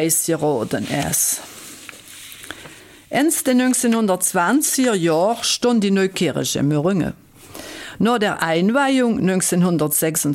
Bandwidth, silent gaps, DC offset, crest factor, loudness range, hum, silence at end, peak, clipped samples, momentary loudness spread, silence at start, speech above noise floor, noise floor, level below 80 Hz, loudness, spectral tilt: 17 kHz; none; under 0.1%; 14 dB; 4 LU; none; 0 s; -4 dBFS; under 0.1%; 18 LU; 0 s; 24 dB; -42 dBFS; -54 dBFS; -18 LUFS; -4 dB/octave